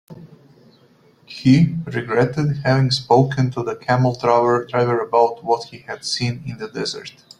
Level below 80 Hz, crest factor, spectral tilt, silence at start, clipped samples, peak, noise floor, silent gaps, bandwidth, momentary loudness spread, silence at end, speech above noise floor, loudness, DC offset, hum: -52 dBFS; 18 dB; -6.5 dB/octave; 0.1 s; under 0.1%; -2 dBFS; -53 dBFS; none; 10.5 kHz; 11 LU; 0.3 s; 35 dB; -19 LUFS; under 0.1%; none